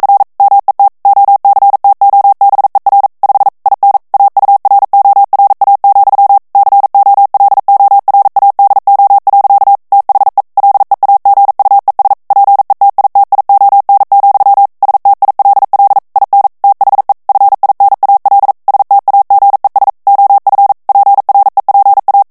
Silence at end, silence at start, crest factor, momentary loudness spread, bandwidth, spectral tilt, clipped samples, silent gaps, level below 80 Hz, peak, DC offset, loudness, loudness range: 0.1 s; 0 s; 6 dB; 3 LU; 2 kHz; -5 dB/octave; under 0.1%; none; -58 dBFS; 0 dBFS; 0.1%; -7 LUFS; 1 LU